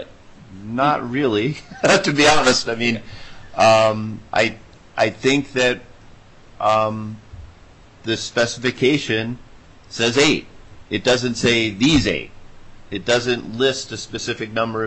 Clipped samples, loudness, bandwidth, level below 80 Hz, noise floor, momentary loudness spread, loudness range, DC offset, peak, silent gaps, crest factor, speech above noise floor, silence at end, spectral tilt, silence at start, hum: under 0.1%; -19 LUFS; 10.5 kHz; -44 dBFS; -46 dBFS; 17 LU; 5 LU; under 0.1%; -4 dBFS; none; 16 dB; 27 dB; 0 s; -4 dB/octave; 0 s; none